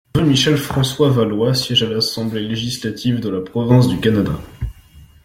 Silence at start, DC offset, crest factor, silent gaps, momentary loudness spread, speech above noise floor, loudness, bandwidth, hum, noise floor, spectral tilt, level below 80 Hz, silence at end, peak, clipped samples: 0.15 s; under 0.1%; 16 dB; none; 9 LU; 28 dB; -17 LUFS; 16 kHz; none; -44 dBFS; -5.5 dB/octave; -40 dBFS; 0.2 s; -2 dBFS; under 0.1%